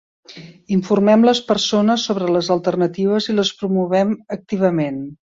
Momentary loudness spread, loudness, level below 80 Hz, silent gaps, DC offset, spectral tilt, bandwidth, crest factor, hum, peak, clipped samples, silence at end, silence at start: 8 LU; -18 LUFS; -60 dBFS; none; under 0.1%; -5.5 dB/octave; 7.8 kHz; 16 dB; none; -2 dBFS; under 0.1%; 0.25 s; 0.3 s